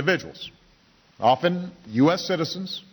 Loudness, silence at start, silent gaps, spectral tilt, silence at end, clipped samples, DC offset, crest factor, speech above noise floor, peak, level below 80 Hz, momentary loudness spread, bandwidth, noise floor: -24 LUFS; 0 s; none; -5.5 dB/octave; 0.1 s; under 0.1%; under 0.1%; 16 dB; 35 dB; -8 dBFS; -64 dBFS; 16 LU; over 20 kHz; -58 dBFS